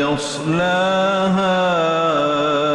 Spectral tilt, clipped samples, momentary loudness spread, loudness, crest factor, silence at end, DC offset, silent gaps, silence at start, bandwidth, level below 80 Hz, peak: -5 dB/octave; under 0.1%; 3 LU; -17 LUFS; 10 dB; 0 s; under 0.1%; none; 0 s; 11.5 kHz; -52 dBFS; -8 dBFS